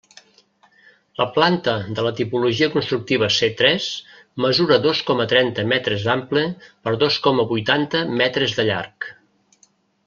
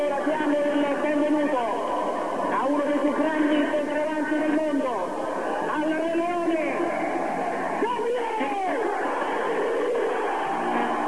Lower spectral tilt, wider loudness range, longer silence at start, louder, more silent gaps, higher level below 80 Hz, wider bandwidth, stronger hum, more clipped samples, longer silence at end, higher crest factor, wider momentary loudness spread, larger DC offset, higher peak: about the same, -5 dB/octave vs -5 dB/octave; about the same, 2 LU vs 2 LU; first, 1.2 s vs 0 s; first, -19 LUFS vs -25 LUFS; neither; first, -58 dBFS vs -66 dBFS; second, 7.4 kHz vs 11 kHz; neither; neither; first, 0.95 s vs 0 s; first, 20 dB vs 12 dB; first, 10 LU vs 4 LU; second, under 0.1% vs 0.8%; first, -2 dBFS vs -12 dBFS